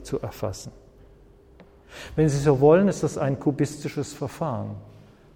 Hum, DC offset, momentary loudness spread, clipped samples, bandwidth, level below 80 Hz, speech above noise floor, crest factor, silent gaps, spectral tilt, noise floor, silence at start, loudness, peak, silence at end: none; under 0.1%; 20 LU; under 0.1%; 16.5 kHz; -48 dBFS; 29 dB; 20 dB; none; -7 dB/octave; -52 dBFS; 0 s; -24 LUFS; -6 dBFS; 0.45 s